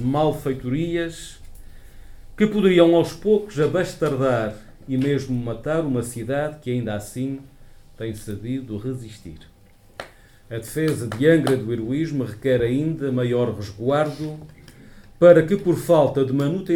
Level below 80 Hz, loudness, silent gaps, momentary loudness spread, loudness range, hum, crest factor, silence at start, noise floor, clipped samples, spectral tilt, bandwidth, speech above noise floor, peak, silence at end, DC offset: -46 dBFS; -21 LUFS; none; 17 LU; 11 LU; none; 20 dB; 0 s; -45 dBFS; under 0.1%; -7 dB/octave; 17 kHz; 24 dB; 0 dBFS; 0 s; under 0.1%